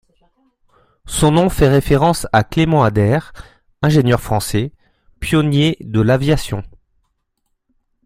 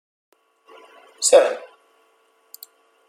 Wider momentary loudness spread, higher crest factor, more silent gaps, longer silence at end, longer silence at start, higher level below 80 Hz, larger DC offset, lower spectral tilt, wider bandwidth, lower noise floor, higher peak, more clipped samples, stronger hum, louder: second, 8 LU vs 27 LU; second, 16 dB vs 22 dB; neither; second, 1.35 s vs 1.5 s; second, 1.05 s vs 1.2 s; first, -34 dBFS vs -72 dBFS; neither; first, -6 dB/octave vs 0.5 dB/octave; about the same, 16 kHz vs 15.5 kHz; first, -69 dBFS vs -61 dBFS; about the same, -2 dBFS vs -2 dBFS; neither; neither; about the same, -15 LUFS vs -17 LUFS